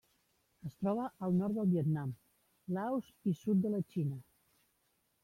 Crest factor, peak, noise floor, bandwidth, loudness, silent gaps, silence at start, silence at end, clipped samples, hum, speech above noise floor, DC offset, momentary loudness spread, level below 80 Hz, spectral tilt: 14 dB; -24 dBFS; -78 dBFS; 14 kHz; -36 LUFS; none; 0.65 s; 1 s; under 0.1%; none; 43 dB; under 0.1%; 17 LU; -74 dBFS; -10 dB/octave